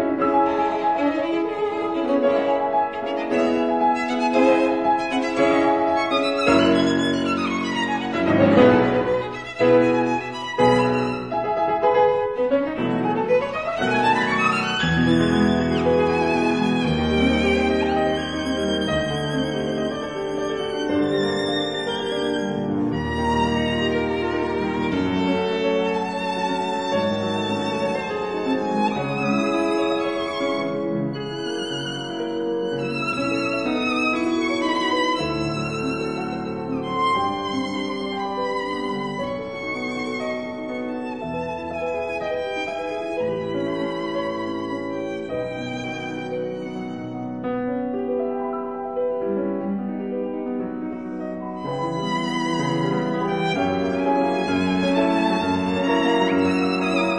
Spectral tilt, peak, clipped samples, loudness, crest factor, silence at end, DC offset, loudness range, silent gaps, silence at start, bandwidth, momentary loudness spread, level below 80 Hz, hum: -6 dB/octave; -2 dBFS; under 0.1%; -22 LUFS; 20 dB; 0 s; 0.2%; 8 LU; none; 0 s; 10.5 kHz; 9 LU; -48 dBFS; none